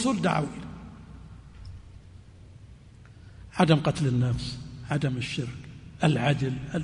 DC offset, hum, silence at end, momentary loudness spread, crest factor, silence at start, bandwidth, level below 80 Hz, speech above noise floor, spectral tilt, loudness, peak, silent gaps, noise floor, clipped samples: under 0.1%; none; 0 s; 24 LU; 20 dB; 0 s; 10.5 kHz; -50 dBFS; 24 dB; -6.5 dB/octave; -27 LUFS; -8 dBFS; none; -50 dBFS; under 0.1%